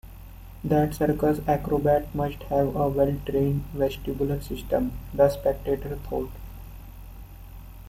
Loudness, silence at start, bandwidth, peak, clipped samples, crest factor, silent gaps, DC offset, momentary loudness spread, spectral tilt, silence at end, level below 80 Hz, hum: -26 LUFS; 0.05 s; 16.5 kHz; -6 dBFS; under 0.1%; 20 dB; none; under 0.1%; 22 LU; -8 dB/octave; 0 s; -40 dBFS; none